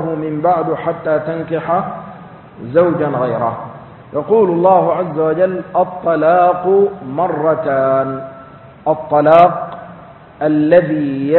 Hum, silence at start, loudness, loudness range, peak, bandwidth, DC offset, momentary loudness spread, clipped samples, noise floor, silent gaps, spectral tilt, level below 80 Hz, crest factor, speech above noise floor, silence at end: none; 0 s; -14 LUFS; 4 LU; 0 dBFS; 4.3 kHz; under 0.1%; 15 LU; under 0.1%; -37 dBFS; none; -10.5 dB/octave; -52 dBFS; 14 dB; 24 dB; 0 s